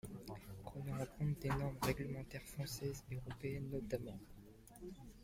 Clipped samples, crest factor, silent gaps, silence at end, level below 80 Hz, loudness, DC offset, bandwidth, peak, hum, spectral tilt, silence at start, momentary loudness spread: under 0.1%; 20 dB; none; 0 s; -58 dBFS; -45 LUFS; under 0.1%; 16.5 kHz; -26 dBFS; none; -6 dB/octave; 0.05 s; 15 LU